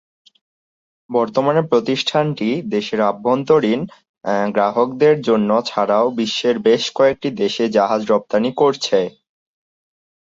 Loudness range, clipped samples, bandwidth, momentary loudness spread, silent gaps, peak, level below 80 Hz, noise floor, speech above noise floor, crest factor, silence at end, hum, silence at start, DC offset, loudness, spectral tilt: 2 LU; under 0.1%; 7.8 kHz; 6 LU; 4.09-4.14 s; -2 dBFS; -62 dBFS; under -90 dBFS; over 73 dB; 16 dB; 1.2 s; none; 1.1 s; under 0.1%; -17 LUFS; -5.5 dB/octave